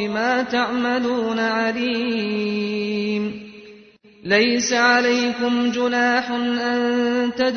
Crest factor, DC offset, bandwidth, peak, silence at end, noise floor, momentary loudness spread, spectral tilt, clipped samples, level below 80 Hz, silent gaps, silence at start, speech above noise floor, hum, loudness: 16 dB; under 0.1%; 6.6 kHz; -4 dBFS; 0 s; -48 dBFS; 7 LU; -3.5 dB/octave; under 0.1%; -60 dBFS; none; 0 s; 28 dB; none; -20 LUFS